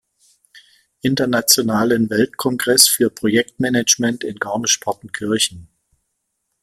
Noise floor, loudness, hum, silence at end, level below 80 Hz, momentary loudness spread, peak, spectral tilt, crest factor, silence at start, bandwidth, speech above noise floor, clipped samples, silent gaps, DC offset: -73 dBFS; -16 LUFS; none; 1 s; -56 dBFS; 11 LU; 0 dBFS; -2.5 dB/octave; 20 dB; 0.55 s; 16.5 kHz; 56 dB; under 0.1%; none; under 0.1%